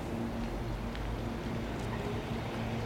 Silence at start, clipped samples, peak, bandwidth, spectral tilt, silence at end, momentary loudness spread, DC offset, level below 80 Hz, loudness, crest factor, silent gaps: 0 s; under 0.1%; -24 dBFS; 17 kHz; -6.5 dB/octave; 0 s; 2 LU; under 0.1%; -44 dBFS; -37 LUFS; 12 dB; none